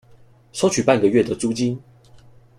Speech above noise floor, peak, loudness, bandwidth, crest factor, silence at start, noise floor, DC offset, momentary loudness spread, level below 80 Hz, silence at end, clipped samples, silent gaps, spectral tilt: 31 dB; -4 dBFS; -19 LUFS; 14 kHz; 18 dB; 0.55 s; -50 dBFS; under 0.1%; 13 LU; -56 dBFS; 0.8 s; under 0.1%; none; -5 dB/octave